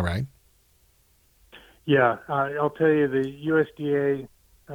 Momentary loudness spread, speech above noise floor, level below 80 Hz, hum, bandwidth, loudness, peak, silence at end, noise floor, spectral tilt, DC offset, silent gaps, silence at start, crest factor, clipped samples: 11 LU; 39 dB; -52 dBFS; none; 18.5 kHz; -24 LUFS; -6 dBFS; 0 s; -62 dBFS; -8 dB/octave; under 0.1%; none; 0 s; 18 dB; under 0.1%